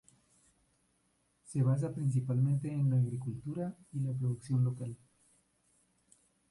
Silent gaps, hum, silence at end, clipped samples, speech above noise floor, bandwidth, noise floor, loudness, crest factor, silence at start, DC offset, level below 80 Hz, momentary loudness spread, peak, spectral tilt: none; 60 Hz at -60 dBFS; 1.55 s; under 0.1%; 43 dB; 11.5 kHz; -75 dBFS; -34 LUFS; 14 dB; 1.5 s; under 0.1%; -68 dBFS; 9 LU; -20 dBFS; -9 dB/octave